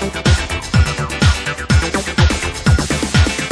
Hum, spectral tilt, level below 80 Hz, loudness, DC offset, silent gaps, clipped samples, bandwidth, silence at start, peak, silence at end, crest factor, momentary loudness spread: none; -4.5 dB/octave; -20 dBFS; -16 LUFS; under 0.1%; none; under 0.1%; 11 kHz; 0 s; -2 dBFS; 0 s; 14 dB; 3 LU